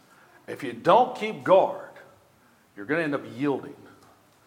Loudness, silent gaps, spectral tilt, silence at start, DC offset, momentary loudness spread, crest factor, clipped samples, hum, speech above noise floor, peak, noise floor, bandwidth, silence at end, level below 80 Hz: -24 LUFS; none; -6.5 dB/octave; 0.5 s; under 0.1%; 21 LU; 22 dB; under 0.1%; none; 36 dB; -6 dBFS; -60 dBFS; 15 kHz; 0.7 s; -76 dBFS